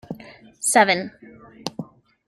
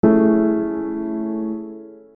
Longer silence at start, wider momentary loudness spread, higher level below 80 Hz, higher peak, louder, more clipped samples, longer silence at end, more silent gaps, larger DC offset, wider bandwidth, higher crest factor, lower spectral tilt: about the same, 0.1 s vs 0.05 s; first, 21 LU vs 17 LU; second, -66 dBFS vs -54 dBFS; about the same, -2 dBFS vs -2 dBFS; about the same, -19 LUFS vs -20 LUFS; neither; first, 0.45 s vs 0.2 s; neither; neither; first, 16 kHz vs 2.7 kHz; first, 22 dB vs 16 dB; second, -2.5 dB/octave vs -12.5 dB/octave